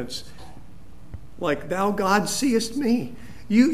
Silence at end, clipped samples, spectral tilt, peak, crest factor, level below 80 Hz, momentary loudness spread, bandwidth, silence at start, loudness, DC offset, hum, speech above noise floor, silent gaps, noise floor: 0 s; under 0.1%; -4.5 dB/octave; -4 dBFS; 18 dB; -50 dBFS; 23 LU; 14.5 kHz; 0 s; -23 LUFS; 2%; none; 23 dB; none; -47 dBFS